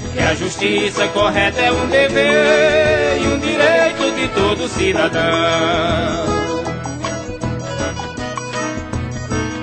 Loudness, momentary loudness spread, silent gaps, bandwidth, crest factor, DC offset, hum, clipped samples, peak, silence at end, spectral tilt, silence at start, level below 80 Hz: -16 LUFS; 11 LU; none; 9.2 kHz; 16 dB; under 0.1%; none; under 0.1%; 0 dBFS; 0 s; -4.5 dB/octave; 0 s; -36 dBFS